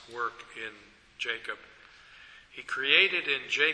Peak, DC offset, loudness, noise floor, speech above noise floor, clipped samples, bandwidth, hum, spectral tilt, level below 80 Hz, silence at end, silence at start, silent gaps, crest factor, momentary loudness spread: -6 dBFS; under 0.1%; -27 LUFS; -53 dBFS; 23 dB; under 0.1%; 11 kHz; none; -1.5 dB/octave; -70 dBFS; 0 s; 0 s; none; 26 dB; 21 LU